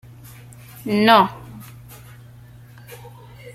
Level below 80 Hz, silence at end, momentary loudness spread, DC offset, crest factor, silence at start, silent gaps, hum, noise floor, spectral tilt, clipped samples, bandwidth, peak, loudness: -56 dBFS; 0.05 s; 28 LU; under 0.1%; 22 dB; 0.85 s; none; none; -43 dBFS; -5.5 dB/octave; under 0.1%; 16 kHz; 0 dBFS; -16 LUFS